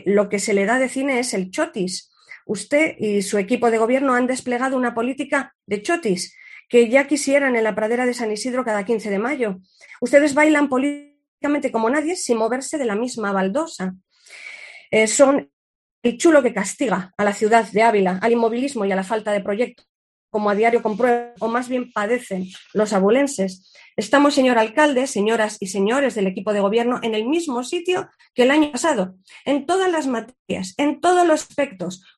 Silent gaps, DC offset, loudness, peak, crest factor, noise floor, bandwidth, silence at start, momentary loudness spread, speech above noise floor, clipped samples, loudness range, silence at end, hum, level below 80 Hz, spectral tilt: 5.55-5.59 s, 11.28-11.38 s, 15.53-16.02 s, 19.89-20.28 s, 30.39-30.46 s; under 0.1%; -20 LUFS; 0 dBFS; 18 dB; -40 dBFS; 12.5 kHz; 0.05 s; 11 LU; 21 dB; under 0.1%; 3 LU; 0.2 s; none; -66 dBFS; -4.5 dB/octave